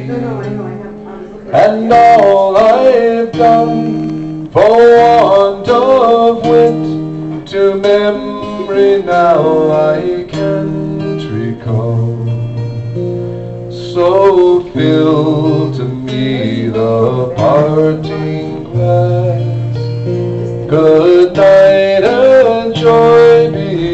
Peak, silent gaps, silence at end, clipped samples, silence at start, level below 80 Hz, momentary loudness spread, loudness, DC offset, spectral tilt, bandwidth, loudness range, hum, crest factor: 0 dBFS; none; 0 s; under 0.1%; 0 s; -42 dBFS; 13 LU; -10 LUFS; under 0.1%; -8 dB/octave; 8.2 kHz; 6 LU; none; 10 dB